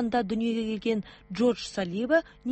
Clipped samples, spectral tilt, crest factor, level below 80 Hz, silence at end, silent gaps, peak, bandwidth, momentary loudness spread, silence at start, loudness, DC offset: under 0.1%; -5.5 dB/octave; 14 dB; -58 dBFS; 0 s; none; -14 dBFS; 8.4 kHz; 6 LU; 0 s; -28 LUFS; under 0.1%